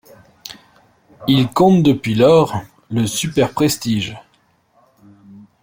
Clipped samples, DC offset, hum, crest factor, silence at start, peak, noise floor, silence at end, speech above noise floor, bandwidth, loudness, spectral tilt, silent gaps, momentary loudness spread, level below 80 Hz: under 0.1%; under 0.1%; none; 16 dB; 0.5 s; -2 dBFS; -59 dBFS; 0.25 s; 44 dB; 17 kHz; -16 LUFS; -5.5 dB/octave; none; 20 LU; -50 dBFS